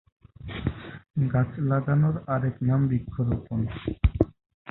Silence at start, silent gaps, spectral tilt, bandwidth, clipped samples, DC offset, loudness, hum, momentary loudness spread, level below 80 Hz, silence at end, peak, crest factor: 0.4 s; 1.10-1.14 s, 4.54-4.65 s; -12 dB/octave; 4.1 kHz; under 0.1%; under 0.1%; -27 LUFS; none; 10 LU; -36 dBFS; 0 s; -4 dBFS; 22 dB